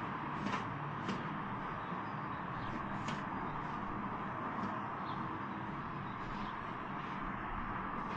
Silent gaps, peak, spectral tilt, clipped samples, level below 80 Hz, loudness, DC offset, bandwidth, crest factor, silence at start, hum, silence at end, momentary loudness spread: none; -24 dBFS; -6.5 dB/octave; under 0.1%; -56 dBFS; -41 LUFS; under 0.1%; 9 kHz; 18 dB; 0 s; none; 0 s; 3 LU